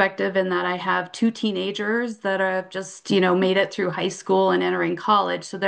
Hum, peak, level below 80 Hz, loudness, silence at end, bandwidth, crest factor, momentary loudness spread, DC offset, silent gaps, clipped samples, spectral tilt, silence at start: none; -4 dBFS; -72 dBFS; -22 LUFS; 0 s; 9.8 kHz; 18 dB; 6 LU; under 0.1%; none; under 0.1%; -5 dB/octave; 0 s